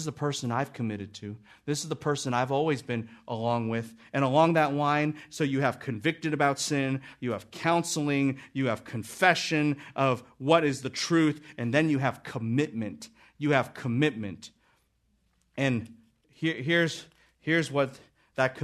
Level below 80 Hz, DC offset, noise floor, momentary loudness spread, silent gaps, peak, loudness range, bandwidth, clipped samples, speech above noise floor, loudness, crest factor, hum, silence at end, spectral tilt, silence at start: -68 dBFS; under 0.1%; -71 dBFS; 14 LU; none; -6 dBFS; 5 LU; 13.5 kHz; under 0.1%; 43 dB; -28 LUFS; 22 dB; none; 0 s; -5 dB/octave; 0 s